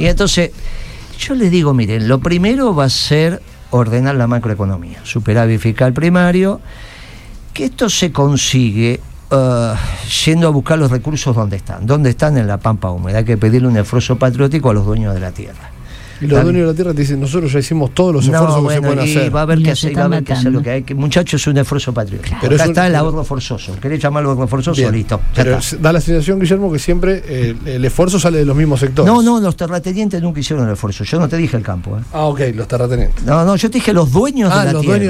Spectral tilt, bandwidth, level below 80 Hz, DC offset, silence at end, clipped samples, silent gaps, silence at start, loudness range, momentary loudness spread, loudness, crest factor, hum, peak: -6 dB/octave; 15.5 kHz; -26 dBFS; under 0.1%; 0 s; under 0.1%; none; 0 s; 2 LU; 9 LU; -14 LUFS; 12 dB; none; 0 dBFS